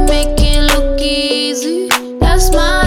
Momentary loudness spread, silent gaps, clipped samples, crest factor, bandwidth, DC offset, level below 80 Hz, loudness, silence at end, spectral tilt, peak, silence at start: 3 LU; none; under 0.1%; 12 dB; 16.5 kHz; under 0.1%; -14 dBFS; -13 LUFS; 0 s; -4 dB/octave; 0 dBFS; 0 s